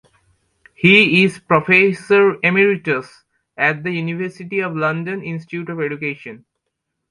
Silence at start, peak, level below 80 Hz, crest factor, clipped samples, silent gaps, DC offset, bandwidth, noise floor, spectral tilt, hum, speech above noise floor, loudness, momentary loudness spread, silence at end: 0.8 s; 0 dBFS; -62 dBFS; 18 dB; under 0.1%; none; under 0.1%; 11 kHz; -76 dBFS; -6.5 dB/octave; none; 59 dB; -16 LUFS; 15 LU; 0.75 s